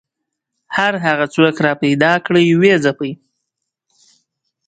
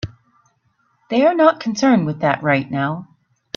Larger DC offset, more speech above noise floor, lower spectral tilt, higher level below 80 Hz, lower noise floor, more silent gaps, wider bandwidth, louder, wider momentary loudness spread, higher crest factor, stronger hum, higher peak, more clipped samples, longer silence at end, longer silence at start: neither; first, 64 dB vs 47 dB; about the same, -6 dB/octave vs -6 dB/octave; about the same, -60 dBFS vs -56 dBFS; first, -78 dBFS vs -63 dBFS; neither; first, 9.2 kHz vs 7.2 kHz; first, -14 LUFS vs -17 LUFS; about the same, 12 LU vs 10 LU; about the same, 16 dB vs 18 dB; neither; about the same, 0 dBFS vs 0 dBFS; neither; first, 1.55 s vs 0.55 s; first, 0.7 s vs 0.05 s